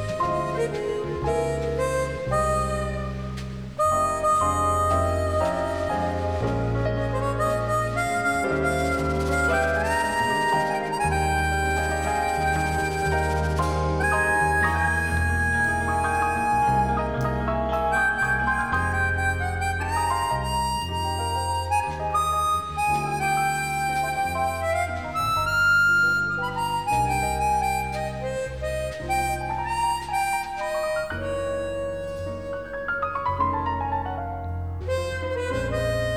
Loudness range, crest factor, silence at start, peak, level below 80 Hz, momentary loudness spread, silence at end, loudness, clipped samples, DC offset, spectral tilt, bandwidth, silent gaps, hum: 5 LU; 14 dB; 0 s; -10 dBFS; -36 dBFS; 7 LU; 0 s; -24 LUFS; under 0.1%; 0.3%; -5 dB/octave; 18 kHz; none; none